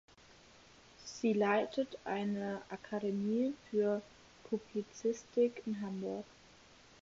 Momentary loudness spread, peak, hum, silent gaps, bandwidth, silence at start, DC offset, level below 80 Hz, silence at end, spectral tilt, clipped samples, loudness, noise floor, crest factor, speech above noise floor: 10 LU; -18 dBFS; none; none; 7.6 kHz; 1 s; under 0.1%; -74 dBFS; 0.8 s; -5.5 dB/octave; under 0.1%; -37 LUFS; -61 dBFS; 20 dB; 25 dB